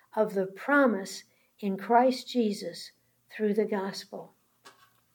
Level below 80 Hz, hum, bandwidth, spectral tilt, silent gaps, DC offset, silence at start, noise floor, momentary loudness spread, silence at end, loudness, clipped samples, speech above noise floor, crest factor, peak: -90 dBFS; none; 19 kHz; -5 dB/octave; none; under 0.1%; 0.15 s; -58 dBFS; 20 LU; 0.45 s; -28 LUFS; under 0.1%; 30 dB; 20 dB; -10 dBFS